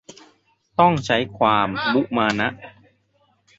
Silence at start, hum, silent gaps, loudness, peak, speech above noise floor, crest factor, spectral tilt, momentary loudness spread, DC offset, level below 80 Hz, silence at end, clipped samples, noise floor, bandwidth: 0.8 s; none; none; -20 LUFS; -2 dBFS; 44 dB; 20 dB; -5.5 dB/octave; 8 LU; under 0.1%; -54 dBFS; 0.9 s; under 0.1%; -64 dBFS; 8 kHz